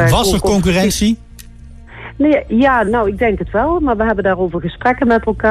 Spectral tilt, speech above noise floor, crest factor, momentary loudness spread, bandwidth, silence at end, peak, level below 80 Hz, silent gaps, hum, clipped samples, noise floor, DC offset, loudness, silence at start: -5.5 dB/octave; 22 dB; 12 dB; 5 LU; 14.5 kHz; 0 s; -2 dBFS; -28 dBFS; none; none; under 0.1%; -36 dBFS; under 0.1%; -14 LUFS; 0 s